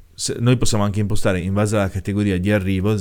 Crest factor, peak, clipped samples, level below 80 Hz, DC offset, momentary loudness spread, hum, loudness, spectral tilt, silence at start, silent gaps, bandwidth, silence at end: 16 dB; -2 dBFS; under 0.1%; -34 dBFS; under 0.1%; 3 LU; none; -20 LUFS; -5.5 dB/octave; 0.2 s; none; 17 kHz; 0 s